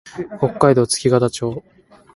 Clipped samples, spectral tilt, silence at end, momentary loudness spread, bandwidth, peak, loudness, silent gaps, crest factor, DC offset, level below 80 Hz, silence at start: under 0.1%; -5.5 dB/octave; 0.55 s; 14 LU; 11.5 kHz; 0 dBFS; -17 LUFS; none; 18 dB; under 0.1%; -52 dBFS; 0.05 s